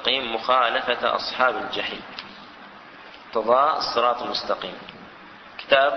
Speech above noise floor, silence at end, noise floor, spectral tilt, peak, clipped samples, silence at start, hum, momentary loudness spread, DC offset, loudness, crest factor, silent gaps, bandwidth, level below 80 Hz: 22 dB; 0 s; -44 dBFS; -3.5 dB/octave; -2 dBFS; under 0.1%; 0 s; none; 23 LU; under 0.1%; -22 LUFS; 22 dB; none; 6.4 kHz; -62 dBFS